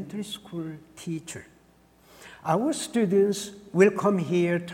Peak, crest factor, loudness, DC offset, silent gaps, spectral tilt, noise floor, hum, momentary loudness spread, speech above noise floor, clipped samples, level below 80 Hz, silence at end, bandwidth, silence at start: -6 dBFS; 20 dB; -26 LUFS; under 0.1%; none; -5.5 dB/octave; -59 dBFS; none; 16 LU; 33 dB; under 0.1%; -66 dBFS; 0 s; 16.5 kHz; 0 s